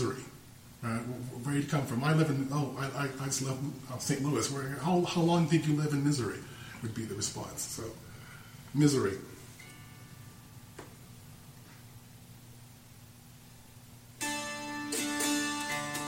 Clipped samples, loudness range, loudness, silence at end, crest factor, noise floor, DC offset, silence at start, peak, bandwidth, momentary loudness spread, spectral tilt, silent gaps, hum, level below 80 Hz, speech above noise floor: under 0.1%; 21 LU; -32 LUFS; 0 s; 22 dB; -54 dBFS; under 0.1%; 0 s; -12 dBFS; 16.5 kHz; 24 LU; -5 dB/octave; none; none; -62 dBFS; 22 dB